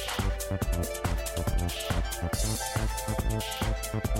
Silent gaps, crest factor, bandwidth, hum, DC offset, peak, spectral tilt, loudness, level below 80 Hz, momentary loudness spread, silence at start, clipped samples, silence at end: none; 12 dB; 16.5 kHz; none; under 0.1%; -18 dBFS; -4.5 dB/octave; -31 LUFS; -34 dBFS; 2 LU; 0 s; under 0.1%; 0 s